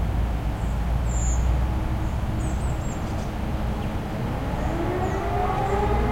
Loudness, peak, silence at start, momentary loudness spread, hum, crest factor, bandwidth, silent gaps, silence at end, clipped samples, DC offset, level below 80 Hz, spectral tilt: -26 LUFS; -10 dBFS; 0 s; 5 LU; none; 14 dB; 15.5 kHz; none; 0 s; under 0.1%; under 0.1%; -28 dBFS; -6.5 dB/octave